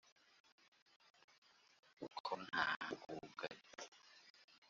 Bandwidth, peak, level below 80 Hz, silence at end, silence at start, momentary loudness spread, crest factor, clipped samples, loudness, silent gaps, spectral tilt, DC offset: 7.6 kHz; -24 dBFS; -88 dBFS; 0.05 s; 2 s; 23 LU; 26 dB; under 0.1%; -46 LUFS; 2.20-2.24 s, 2.76-2.80 s, 3.88-3.92 s, 4.30-4.34 s, 4.44-4.48 s, 4.58-4.62 s; -0.5 dB/octave; under 0.1%